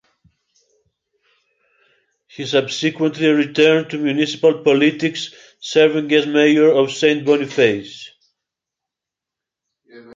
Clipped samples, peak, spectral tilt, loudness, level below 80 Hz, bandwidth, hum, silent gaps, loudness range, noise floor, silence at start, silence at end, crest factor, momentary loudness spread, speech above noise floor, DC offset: under 0.1%; 0 dBFS; -5 dB/octave; -16 LUFS; -66 dBFS; 7.8 kHz; none; none; 6 LU; -86 dBFS; 2.4 s; 0 s; 18 dB; 13 LU; 70 dB; under 0.1%